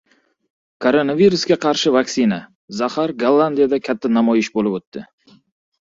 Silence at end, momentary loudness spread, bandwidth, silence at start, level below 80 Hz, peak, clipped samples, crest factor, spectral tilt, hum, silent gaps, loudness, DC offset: 0.9 s; 11 LU; 7.8 kHz; 0.8 s; -60 dBFS; -2 dBFS; under 0.1%; 16 dB; -5 dB/octave; none; 2.55-2.68 s, 4.87-4.92 s; -17 LUFS; under 0.1%